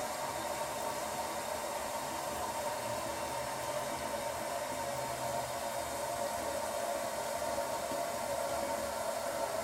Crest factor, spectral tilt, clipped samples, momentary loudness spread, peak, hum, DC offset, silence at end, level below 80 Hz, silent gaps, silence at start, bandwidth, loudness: 14 dB; -2.5 dB/octave; under 0.1%; 2 LU; -22 dBFS; none; under 0.1%; 0 s; -62 dBFS; none; 0 s; 16 kHz; -37 LUFS